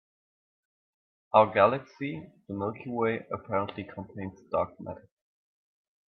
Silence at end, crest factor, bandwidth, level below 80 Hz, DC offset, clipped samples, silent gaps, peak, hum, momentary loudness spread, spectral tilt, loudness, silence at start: 1.1 s; 26 dB; 6.2 kHz; -70 dBFS; under 0.1%; under 0.1%; none; -6 dBFS; none; 18 LU; -8.5 dB/octave; -29 LUFS; 1.35 s